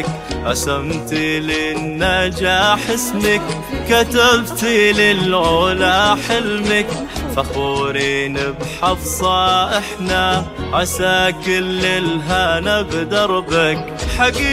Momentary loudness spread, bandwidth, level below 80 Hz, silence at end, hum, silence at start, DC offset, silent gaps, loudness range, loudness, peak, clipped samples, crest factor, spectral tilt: 8 LU; 16.5 kHz; -32 dBFS; 0 s; none; 0 s; under 0.1%; none; 4 LU; -16 LUFS; 0 dBFS; under 0.1%; 16 dB; -3.5 dB/octave